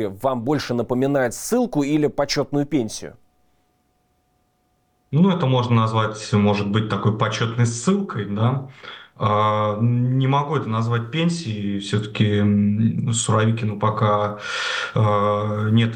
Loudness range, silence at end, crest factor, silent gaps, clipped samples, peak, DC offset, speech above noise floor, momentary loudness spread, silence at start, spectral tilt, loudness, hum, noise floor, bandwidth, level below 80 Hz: 4 LU; 0 s; 14 dB; none; under 0.1%; -6 dBFS; under 0.1%; 46 dB; 6 LU; 0 s; -6 dB/octave; -21 LUFS; none; -66 dBFS; 17 kHz; -56 dBFS